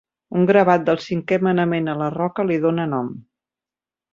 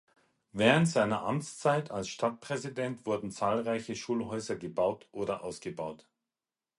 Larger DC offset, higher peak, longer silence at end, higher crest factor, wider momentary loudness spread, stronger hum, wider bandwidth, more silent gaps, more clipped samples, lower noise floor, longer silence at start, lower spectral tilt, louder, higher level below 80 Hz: neither; first, -2 dBFS vs -8 dBFS; about the same, 0.9 s vs 0.85 s; second, 18 dB vs 24 dB; about the same, 11 LU vs 12 LU; neither; second, 7.4 kHz vs 11.5 kHz; neither; neither; about the same, under -90 dBFS vs under -90 dBFS; second, 0.3 s vs 0.55 s; first, -8 dB/octave vs -5.5 dB/octave; first, -19 LUFS vs -32 LUFS; about the same, -62 dBFS vs -66 dBFS